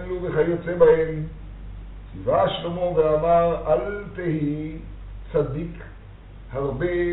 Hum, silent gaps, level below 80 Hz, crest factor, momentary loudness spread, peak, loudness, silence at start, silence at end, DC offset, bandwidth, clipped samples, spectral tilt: none; none; -40 dBFS; 20 dB; 22 LU; -2 dBFS; -23 LUFS; 0 s; 0 s; under 0.1%; 4.1 kHz; under 0.1%; -6 dB/octave